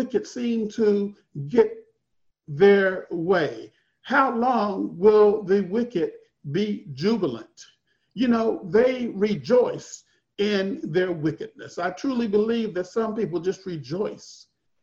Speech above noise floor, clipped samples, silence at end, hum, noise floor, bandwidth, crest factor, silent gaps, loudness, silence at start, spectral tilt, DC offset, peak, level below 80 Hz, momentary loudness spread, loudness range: 50 dB; under 0.1%; 0.45 s; none; -72 dBFS; 7.6 kHz; 18 dB; none; -23 LUFS; 0 s; -6.5 dB/octave; under 0.1%; -6 dBFS; -64 dBFS; 14 LU; 5 LU